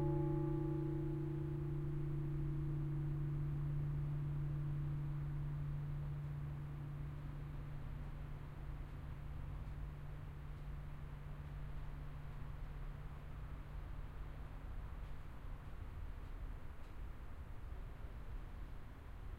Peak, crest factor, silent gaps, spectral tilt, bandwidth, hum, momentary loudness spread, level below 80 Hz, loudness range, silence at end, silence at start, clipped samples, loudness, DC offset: -28 dBFS; 16 dB; none; -9.5 dB/octave; 4.8 kHz; none; 12 LU; -50 dBFS; 11 LU; 0 s; 0 s; under 0.1%; -46 LUFS; under 0.1%